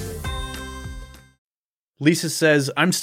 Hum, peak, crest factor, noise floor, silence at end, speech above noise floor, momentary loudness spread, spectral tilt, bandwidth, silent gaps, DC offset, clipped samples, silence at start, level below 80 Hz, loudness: none; -4 dBFS; 20 dB; under -90 dBFS; 0 s; over 71 dB; 18 LU; -4.5 dB/octave; 16.5 kHz; 1.38-1.93 s; under 0.1%; under 0.1%; 0 s; -38 dBFS; -21 LUFS